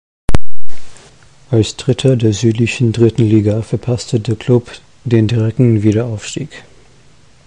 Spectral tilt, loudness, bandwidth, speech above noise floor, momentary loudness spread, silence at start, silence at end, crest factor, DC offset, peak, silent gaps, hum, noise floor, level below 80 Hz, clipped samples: -7 dB/octave; -14 LUFS; 11 kHz; 34 dB; 10 LU; 0.25 s; 0 s; 12 dB; under 0.1%; 0 dBFS; none; none; -47 dBFS; -30 dBFS; under 0.1%